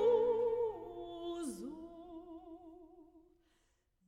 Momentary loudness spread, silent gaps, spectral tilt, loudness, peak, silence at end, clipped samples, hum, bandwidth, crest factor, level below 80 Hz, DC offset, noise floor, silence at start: 22 LU; none; -5.5 dB/octave; -38 LUFS; -20 dBFS; 0.9 s; under 0.1%; none; 13 kHz; 18 dB; -68 dBFS; under 0.1%; -77 dBFS; 0 s